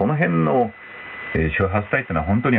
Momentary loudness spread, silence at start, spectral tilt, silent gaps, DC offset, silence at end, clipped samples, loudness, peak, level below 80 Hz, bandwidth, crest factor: 13 LU; 0 s; -11 dB/octave; none; under 0.1%; 0 s; under 0.1%; -21 LUFS; -6 dBFS; -38 dBFS; 4.1 kHz; 14 dB